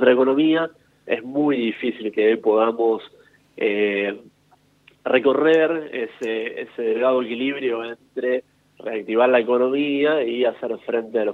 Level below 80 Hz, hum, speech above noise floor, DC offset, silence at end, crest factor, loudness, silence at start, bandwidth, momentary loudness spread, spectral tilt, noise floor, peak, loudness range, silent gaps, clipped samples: -74 dBFS; 50 Hz at -70 dBFS; 38 dB; under 0.1%; 0 s; 20 dB; -21 LUFS; 0 s; 7.2 kHz; 12 LU; -6.5 dB/octave; -59 dBFS; -2 dBFS; 2 LU; none; under 0.1%